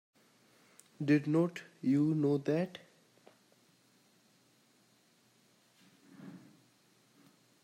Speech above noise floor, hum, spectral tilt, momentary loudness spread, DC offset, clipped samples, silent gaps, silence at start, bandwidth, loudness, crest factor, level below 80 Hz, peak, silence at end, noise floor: 38 dB; none; -8 dB/octave; 24 LU; under 0.1%; under 0.1%; none; 1 s; 11.5 kHz; -32 LUFS; 20 dB; -84 dBFS; -18 dBFS; 1.25 s; -69 dBFS